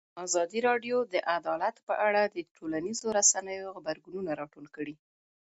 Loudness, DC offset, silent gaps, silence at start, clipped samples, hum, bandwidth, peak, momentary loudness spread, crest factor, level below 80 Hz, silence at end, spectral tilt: -30 LUFS; under 0.1%; 1.83-1.87 s, 2.51-2.55 s; 0.15 s; under 0.1%; none; 8.2 kHz; -10 dBFS; 16 LU; 22 dB; -74 dBFS; 0.65 s; -1.5 dB/octave